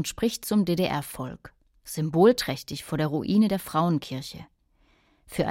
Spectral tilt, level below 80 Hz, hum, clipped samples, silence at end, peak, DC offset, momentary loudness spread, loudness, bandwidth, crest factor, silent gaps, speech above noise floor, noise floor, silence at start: -6 dB/octave; -54 dBFS; none; under 0.1%; 0 s; -8 dBFS; under 0.1%; 16 LU; -26 LUFS; 16.5 kHz; 20 dB; none; 39 dB; -64 dBFS; 0 s